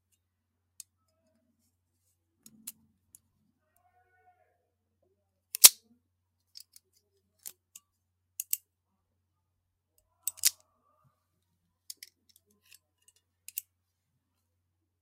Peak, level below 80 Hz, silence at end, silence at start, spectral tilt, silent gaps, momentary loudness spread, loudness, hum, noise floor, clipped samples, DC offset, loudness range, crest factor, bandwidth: 0 dBFS; -80 dBFS; 4.5 s; 2.65 s; 3.5 dB/octave; none; 30 LU; -23 LUFS; none; -81 dBFS; under 0.1%; under 0.1%; 22 LU; 36 dB; 16 kHz